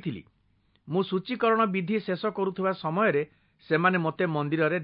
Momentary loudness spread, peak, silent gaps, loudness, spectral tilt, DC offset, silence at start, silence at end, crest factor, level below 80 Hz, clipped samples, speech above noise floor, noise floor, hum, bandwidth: 7 LU; -10 dBFS; none; -27 LUFS; -11 dB/octave; under 0.1%; 0.05 s; 0 s; 18 dB; -70 dBFS; under 0.1%; 41 dB; -67 dBFS; none; 5.4 kHz